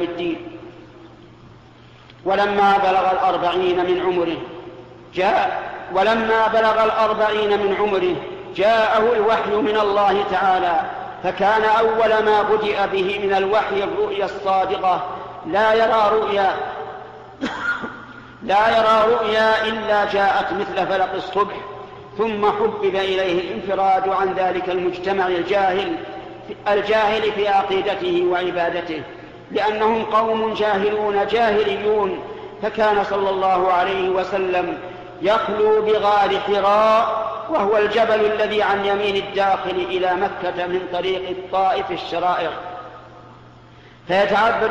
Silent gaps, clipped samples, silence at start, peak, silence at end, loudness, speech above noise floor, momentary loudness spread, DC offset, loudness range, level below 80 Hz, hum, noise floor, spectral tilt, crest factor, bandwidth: none; under 0.1%; 0 s; -8 dBFS; 0 s; -19 LUFS; 27 dB; 13 LU; under 0.1%; 3 LU; -52 dBFS; none; -45 dBFS; -5.5 dB/octave; 12 dB; 8.6 kHz